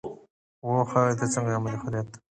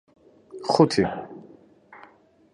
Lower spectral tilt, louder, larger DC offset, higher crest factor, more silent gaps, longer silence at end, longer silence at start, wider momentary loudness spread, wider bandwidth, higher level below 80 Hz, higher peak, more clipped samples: about the same, -6.5 dB/octave vs -6 dB/octave; second, -27 LUFS vs -22 LUFS; neither; about the same, 20 dB vs 22 dB; first, 0.30-0.62 s vs none; second, 0.15 s vs 1.15 s; second, 0.05 s vs 0.55 s; second, 11 LU vs 26 LU; second, 9.8 kHz vs 11 kHz; about the same, -60 dBFS vs -58 dBFS; second, -8 dBFS vs -4 dBFS; neither